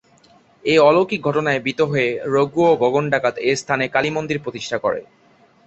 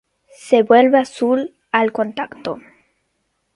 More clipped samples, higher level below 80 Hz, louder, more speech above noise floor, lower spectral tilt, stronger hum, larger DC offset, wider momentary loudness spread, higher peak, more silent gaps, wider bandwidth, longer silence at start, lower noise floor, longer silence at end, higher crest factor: neither; first, -58 dBFS vs -66 dBFS; second, -19 LUFS vs -16 LUFS; second, 36 dB vs 54 dB; about the same, -5.5 dB/octave vs -5 dB/octave; neither; neither; second, 10 LU vs 16 LU; about the same, -2 dBFS vs 0 dBFS; neither; second, 8.4 kHz vs 11.5 kHz; first, 0.65 s vs 0.45 s; second, -54 dBFS vs -69 dBFS; second, 0.65 s vs 0.95 s; about the same, 18 dB vs 18 dB